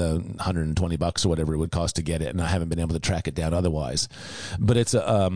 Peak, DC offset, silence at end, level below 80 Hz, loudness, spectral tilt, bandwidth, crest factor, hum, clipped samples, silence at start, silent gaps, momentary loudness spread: -10 dBFS; 0.3%; 0 s; -36 dBFS; -25 LUFS; -5.5 dB/octave; 10.5 kHz; 14 dB; none; under 0.1%; 0 s; none; 6 LU